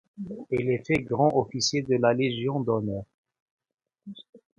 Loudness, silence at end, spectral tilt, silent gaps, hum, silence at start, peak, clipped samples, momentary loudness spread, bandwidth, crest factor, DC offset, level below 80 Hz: -26 LUFS; 0.2 s; -5 dB/octave; 3.14-3.24 s, 3.40-3.58 s, 4.29-4.33 s; none; 0.2 s; -8 dBFS; under 0.1%; 20 LU; 10.5 kHz; 20 dB; under 0.1%; -58 dBFS